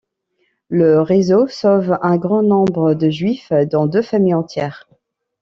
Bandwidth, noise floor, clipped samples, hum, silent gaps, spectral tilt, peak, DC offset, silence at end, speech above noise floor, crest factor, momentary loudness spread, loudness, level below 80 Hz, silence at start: 7.4 kHz; -66 dBFS; under 0.1%; none; none; -8 dB/octave; -2 dBFS; under 0.1%; 0.65 s; 52 dB; 12 dB; 7 LU; -15 LUFS; -58 dBFS; 0.7 s